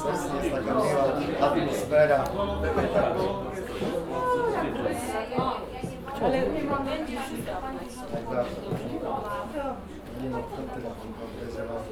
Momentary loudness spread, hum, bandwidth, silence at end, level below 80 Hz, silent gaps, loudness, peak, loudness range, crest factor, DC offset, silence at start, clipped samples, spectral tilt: 11 LU; none; 17.5 kHz; 0 s; -46 dBFS; none; -29 LUFS; -10 dBFS; 8 LU; 18 dB; under 0.1%; 0 s; under 0.1%; -6 dB/octave